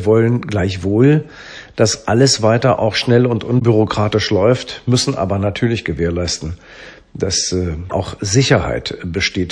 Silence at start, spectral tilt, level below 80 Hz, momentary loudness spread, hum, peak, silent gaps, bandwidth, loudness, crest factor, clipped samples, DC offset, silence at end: 0 s; -5 dB/octave; -38 dBFS; 10 LU; none; 0 dBFS; none; 10.5 kHz; -16 LUFS; 16 dB; under 0.1%; under 0.1%; 0 s